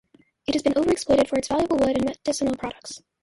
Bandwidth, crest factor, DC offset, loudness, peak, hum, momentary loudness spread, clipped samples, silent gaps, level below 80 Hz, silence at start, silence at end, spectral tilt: 11.5 kHz; 16 dB; under 0.1%; -23 LUFS; -6 dBFS; none; 13 LU; under 0.1%; none; -50 dBFS; 0.5 s; 0.25 s; -4.5 dB/octave